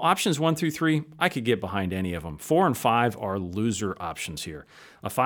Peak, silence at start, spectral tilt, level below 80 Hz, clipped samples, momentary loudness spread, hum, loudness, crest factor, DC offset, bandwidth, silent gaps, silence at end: -6 dBFS; 0 s; -5 dB/octave; -58 dBFS; under 0.1%; 11 LU; none; -26 LUFS; 20 dB; under 0.1%; over 20 kHz; none; 0 s